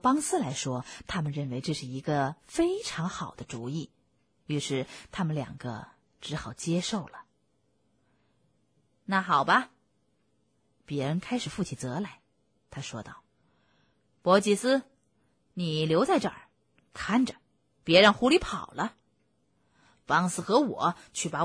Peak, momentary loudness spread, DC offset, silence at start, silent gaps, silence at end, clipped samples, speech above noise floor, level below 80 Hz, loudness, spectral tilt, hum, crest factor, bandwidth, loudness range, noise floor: -8 dBFS; 16 LU; under 0.1%; 0.05 s; none; 0 s; under 0.1%; 45 dB; -58 dBFS; -28 LUFS; -4.5 dB/octave; none; 22 dB; 11 kHz; 10 LU; -73 dBFS